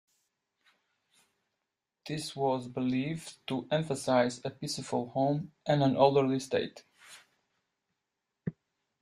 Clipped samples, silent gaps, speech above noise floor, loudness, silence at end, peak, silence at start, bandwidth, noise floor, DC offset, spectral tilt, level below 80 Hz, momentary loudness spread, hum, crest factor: under 0.1%; none; 56 dB; -31 LUFS; 0.5 s; -10 dBFS; 2.05 s; 13 kHz; -87 dBFS; under 0.1%; -6 dB/octave; -72 dBFS; 16 LU; none; 24 dB